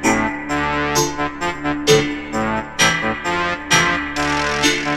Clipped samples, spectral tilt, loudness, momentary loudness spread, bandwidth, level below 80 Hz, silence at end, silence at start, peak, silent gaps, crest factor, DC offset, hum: under 0.1%; -3 dB/octave; -18 LUFS; 7 LU; 16 kHz; -40 dBFS; 0 s; 0 s; 0 dBFS; none; 18 dB; under 0.1%; none